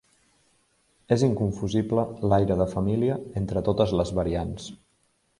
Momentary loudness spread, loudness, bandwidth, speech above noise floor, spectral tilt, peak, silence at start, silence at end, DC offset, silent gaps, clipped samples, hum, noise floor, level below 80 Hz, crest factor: 8 LU; -25 LUFS; 11.5 kHz; 44 dB; -7.5 dB/octave; -6 dBFS; 1.1 s; 0.65 s; under 0.1%; none; under 0.1%; none; -69 dBFS; -44 dBFS; 20 dB